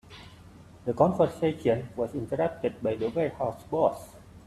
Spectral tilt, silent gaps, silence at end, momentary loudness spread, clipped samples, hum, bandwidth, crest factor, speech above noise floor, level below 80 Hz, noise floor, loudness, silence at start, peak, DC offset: -7.5 dB/octave; none; 0.05 s; 14 LU; under 0.1%; none; 13 kHz; 22 dB; 23 dB; -58 dBFS; -50 dBFS; -28 LUFS; 0.05 s; -6 dBFS; under 0.1%